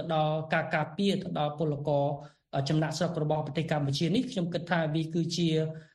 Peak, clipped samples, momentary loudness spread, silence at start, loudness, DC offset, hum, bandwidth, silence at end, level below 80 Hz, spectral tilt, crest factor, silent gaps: -14 dBFS; under 0.1%; 4 LU; 0 s; -30 LUFS; under 0.1%; none; 12 kHz; 0.1 s; -64 dBFS; -6 dB/octave; 16 dB; none